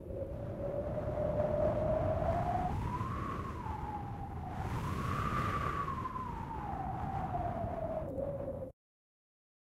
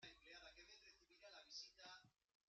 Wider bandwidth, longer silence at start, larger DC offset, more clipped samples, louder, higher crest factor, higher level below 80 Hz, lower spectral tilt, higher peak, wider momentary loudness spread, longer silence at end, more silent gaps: first, 15.5 kHz vs 7.6 kHz; about the same, 0 s vs 0 s; neither; neither; first, -37 LUFS vs -61 LUFS; second, 16 dB vs 22 dB; first, -46 dBFS vs -84 dBFS; first, -8 dB/octave vs 0.5 dB/octave; first, -20 dBFS vs -42 dBFS; about the same, 8 LU vs 10 LU; first, 1 s vs 0.35 s; neither